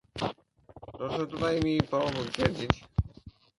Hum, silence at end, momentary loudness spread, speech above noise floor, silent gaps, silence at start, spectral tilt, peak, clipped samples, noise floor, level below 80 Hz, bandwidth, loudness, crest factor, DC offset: none; 0.3 s; 12 LU; 26 dB; none; 0.15 s; -6.5 dB/octave; 0 dBFS; under 0.1%; -55 dBFS; -44 dBFS; 11.5 kHz; -31 LUFS; 30 dB; under 0.1%